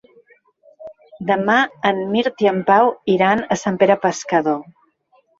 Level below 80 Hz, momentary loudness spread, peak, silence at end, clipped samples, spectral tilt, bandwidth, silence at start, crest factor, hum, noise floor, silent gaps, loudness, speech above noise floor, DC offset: -60 dBFS; 7 LU; -2 dBFS; 0.75 s; under 0.1%; -5 dB/octave; 8 kHz; 0.8 s; 18 dB; none; -59 dBFS; none; -17 LUFS; 42 dB; under 0.1%